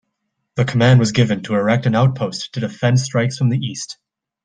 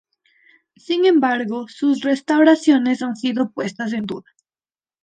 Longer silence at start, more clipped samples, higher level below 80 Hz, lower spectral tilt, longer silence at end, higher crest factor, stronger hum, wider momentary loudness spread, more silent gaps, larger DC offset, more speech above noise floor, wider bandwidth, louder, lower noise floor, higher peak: second, 0.55 s vs 0.9 s; neither; first, -52 dBFS vs -68 dBFS; about the same, -6 dB/octave vs -5 dB/octave; second, 0.5 s vs 0.85 s; about the same, 16 dB vs 16 dB; neither; about the same, 14 LU vs 12 LU; neither; neither; second, 58 dB vs over 72 dB; about the same, 9.4 kHz vs 9.2 kHz; about the same, -17 LUFS vs -18 LUFS; second, -74 dBFS vs under -90 dBFS; about the same, -2 dBFS vs -4 dBFS